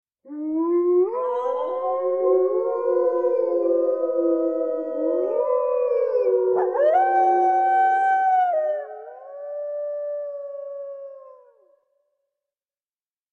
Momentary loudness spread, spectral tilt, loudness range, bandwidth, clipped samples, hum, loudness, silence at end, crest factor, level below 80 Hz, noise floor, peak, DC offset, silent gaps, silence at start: 15 LU; -6 dB/octave; 14 LU; 4 kHz; under 0.1%; none; -22 LUFS; 2 s; 12 dB; -80 dBFS; under -90 dBFS; -10 dBFS; under 0.1%; none; 0.25 s